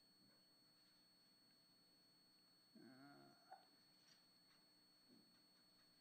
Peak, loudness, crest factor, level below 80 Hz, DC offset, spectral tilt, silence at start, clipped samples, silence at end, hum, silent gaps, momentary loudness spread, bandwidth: -50 dBFS; -67 LUFS; 22 dB; under -90 dBFS; under 0.1%; -3 dB/octave; 0 s; under 0.1%; 0 s; 60 Hz at -90 dBFS; none; 3 LU; 15 kHz